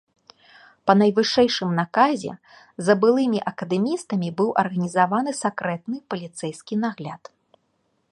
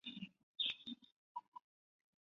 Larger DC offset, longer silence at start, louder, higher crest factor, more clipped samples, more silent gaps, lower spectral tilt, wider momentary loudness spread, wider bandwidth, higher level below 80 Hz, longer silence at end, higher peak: neither; first, 0.85 s vs 0.05 s; first, -22 LUFS vs -46 LUFS; about the same, 20 dB vs 22 dB; neither; second, none vs 0.43-0.54 s, 1.12-1.35 s, 1.48-1.52 s; first, -5.5 dB/octave vs 0 dB/octave; second, 14 LU vs 19 LU; first, 11.5 kHz vs 7.2 kHz; first, -66 dBFS vs -88 dBFS; first, 0.95 s vs 0.65 s; first, -2 dBFS vs -28 dBFS